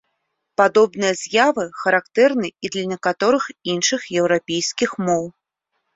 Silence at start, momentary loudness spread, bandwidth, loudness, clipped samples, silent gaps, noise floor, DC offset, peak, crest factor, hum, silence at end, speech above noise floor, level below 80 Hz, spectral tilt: 0.6 s; 8 LU; 8 kHz; -19 LUFS; under 0.1%; none; -75 dBFS; under 0.1%; -2 dBFS; 18 dB; none; 0.65 s; 56 dB; -64 dBFS; -3.5 dB/octave